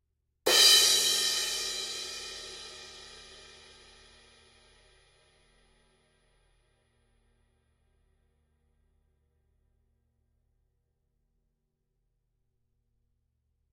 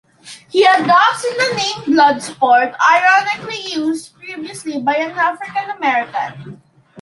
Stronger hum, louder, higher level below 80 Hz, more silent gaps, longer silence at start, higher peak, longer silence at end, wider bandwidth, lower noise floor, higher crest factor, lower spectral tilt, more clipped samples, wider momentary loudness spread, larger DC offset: neither; second, -23 LUFS vs -15 LUFS; about the same, -68 dBFS vs -64 dBFS; neither; first, 0.45 s vs 0.25 s; second, -8 dBFS vs -2 dBFS; first, 10.5 s vs 0 s; first, 16 kHz vs 11.5 kHz; first, -80 dBFS vs -40 dBFS; first, 26 dB vs 14 dB; second, 1.5 dB/octave vs -3 dB/octave; neither; first, 27 LU vs 14 LU; neither